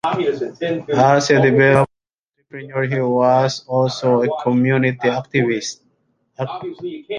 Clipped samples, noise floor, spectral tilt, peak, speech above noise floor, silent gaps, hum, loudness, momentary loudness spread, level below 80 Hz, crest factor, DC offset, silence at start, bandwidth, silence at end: under 0.1%; -76 dBFS; -6 dB/octave; -2 dBFS; 59 dB; 2.13-2.26 s; none; -17 LUFS; 15 LU; -56 dBFS; 16 dB; under 0.1%; 0.05 s; 11 kHz; 0 s